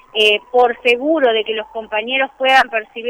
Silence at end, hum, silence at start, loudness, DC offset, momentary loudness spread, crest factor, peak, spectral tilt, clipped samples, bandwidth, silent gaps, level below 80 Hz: 0 s; none; 0.15 s; -15 LUFS; under 0.1%; 9 LU; 14 dB; -2 dBFS; -2 dB/octave; under 0.1%; 14 kHz; none; -58 dBFS